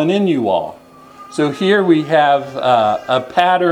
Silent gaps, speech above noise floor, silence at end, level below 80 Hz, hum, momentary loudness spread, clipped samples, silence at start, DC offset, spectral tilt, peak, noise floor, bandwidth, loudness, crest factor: none; 25 dB; 0 s; -60 dBFS; none; 7 LU; under 0.1%; 0 s; under 0.1%; -6 dB/octave; 0 dBFS; -39 dBFS; 11.5 kHz; -15 LUFS; 14 dB